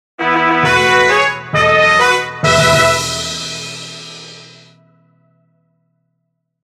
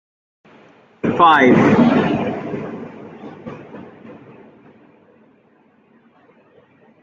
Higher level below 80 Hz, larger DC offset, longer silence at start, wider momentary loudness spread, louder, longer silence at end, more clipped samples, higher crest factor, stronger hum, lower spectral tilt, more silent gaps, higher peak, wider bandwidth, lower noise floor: first, -42 dBFS vs -56 dBFS; neither; second, 0.2 s vs 1.05 s; second, 19 LU vs 25 LU; about the same, -12 LUFS vs -14 LUFS; second, 2.2 s vs 2.9 s; neither; about the same, 16 dB vs 18 dB; neither; second, -3 dB/octave vs -7 dB/octave; neither; about the same, 0 dBFS vs 0 dBFS; first, 16 kHz vs 7.4 kHz; first, -70 dBFS vs -55 dBFS